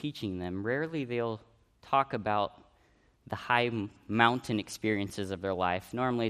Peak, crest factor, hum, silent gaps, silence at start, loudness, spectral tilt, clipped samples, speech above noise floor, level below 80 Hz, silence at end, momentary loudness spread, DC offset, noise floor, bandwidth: -6 dBFS; 26 dB; none; none; 0 s; -31 LUFS; -5.5 dB/octave; under 0.1%; 35 dB; -66 dBFS; 0 s; 10 LU; under 0.1%; -66 dBFS; 15 kHz